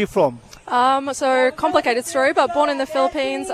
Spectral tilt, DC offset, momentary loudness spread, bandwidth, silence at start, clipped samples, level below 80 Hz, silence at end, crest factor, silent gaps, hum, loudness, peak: -3.5 dB/octave; under 0.1%; 4 LU; 14.5 kHz; 0 s; under 0.1%; -54 dBFS; 0 s; 16 dB; none; none; -19 LUFS; -2 dBFS